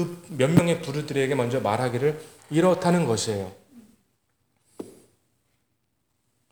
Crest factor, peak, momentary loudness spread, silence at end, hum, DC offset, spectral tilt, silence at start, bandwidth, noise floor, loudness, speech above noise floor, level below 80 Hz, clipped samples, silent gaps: 22 dB; -4 dBFS; 19 LU; 1.6 s; none; under 0.1%; -6 dB/octave; 0 s; over 20 kHz; -74 dBFS; -24 LUFS; 51 dB; -62 dBFS; under 0.1%; none